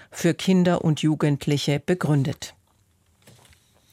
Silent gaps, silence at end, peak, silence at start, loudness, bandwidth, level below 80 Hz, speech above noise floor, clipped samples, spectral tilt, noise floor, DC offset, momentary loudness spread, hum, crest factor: none; 1.45 s; -10 dBFS; 0.15 s; -22 LUFS; 15 kHz; -58 dBFS; 41 dB; under 0.1%; -6 dB/octave; -63 dBFS; under 0.1%; 7 LU; none; 14 dB